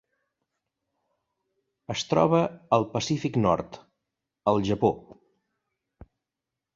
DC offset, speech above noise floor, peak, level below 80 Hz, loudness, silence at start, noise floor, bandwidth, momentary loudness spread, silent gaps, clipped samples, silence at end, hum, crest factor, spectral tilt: under 0.1%; 63 dB; -6 dBFS; -56 dBFS; -26 LUFS; 1.9 s; -87 dBFS; 7.8 kHz; 10 LU; none; under 0.1%; 1.6 s; none; 22 dB; -6 dB/octave